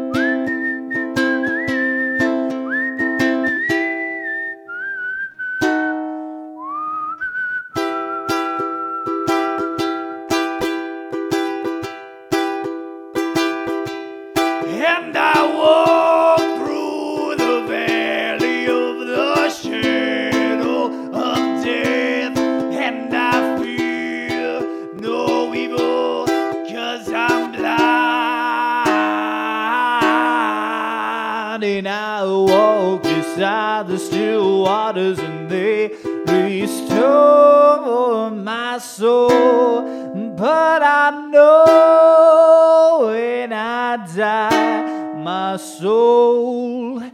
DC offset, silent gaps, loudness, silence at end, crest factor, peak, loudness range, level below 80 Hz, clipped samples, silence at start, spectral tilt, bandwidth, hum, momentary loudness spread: under 0.1%; none; -17 LUFS; 0.05 s; 16 dB; 0 dBFS; 10 LU; -58 dBFS; under 0.1%; 0 s; -5 dB/octave; 16 kHz; none; 12 LU